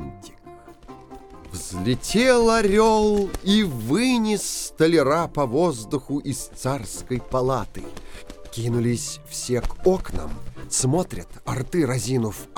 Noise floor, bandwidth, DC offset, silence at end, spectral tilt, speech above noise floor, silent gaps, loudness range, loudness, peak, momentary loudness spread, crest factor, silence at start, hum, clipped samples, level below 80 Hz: -45 dBFS; 19 kHz; 0.1%; 0 s; -5 dB/octave; 23 dB; none; 7 LU; -22 LUFS; -4 dBFS; 20 LU; 20 dB; 0 s; none; under 0.1%; -38 dBFS